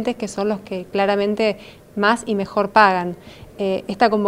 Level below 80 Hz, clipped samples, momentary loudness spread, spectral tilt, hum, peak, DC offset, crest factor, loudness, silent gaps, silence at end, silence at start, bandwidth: -54 dBFS; under 0.1%; 13 LU; -5 dB/octave; none; 0 dBFS; under 0.1%; 20 dB; -20 LUFS; none; 0 s; 0 s; 15.5 kHz